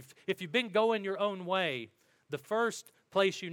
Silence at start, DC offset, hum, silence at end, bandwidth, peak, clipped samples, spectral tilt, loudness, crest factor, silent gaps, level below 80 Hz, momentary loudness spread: 0 s; under 0.1%; none; 0 s; 18 kHz; -14 dBFS; under 0.1%; -4 dB/octave; -32 LUFS; 18 dB; none; -86 dBFS; 14 LU